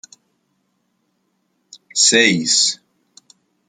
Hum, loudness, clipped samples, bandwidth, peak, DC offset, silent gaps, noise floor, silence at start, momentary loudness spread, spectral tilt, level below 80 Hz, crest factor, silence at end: none; -13 LUFS; under 0.1%; 11 kHz; 0 dBFS; under 0.1%; none; -68 dBFS; 1.95 s; 13 LU; -1 dB/octave; -68 dBFS; 22 dB; 0.95 s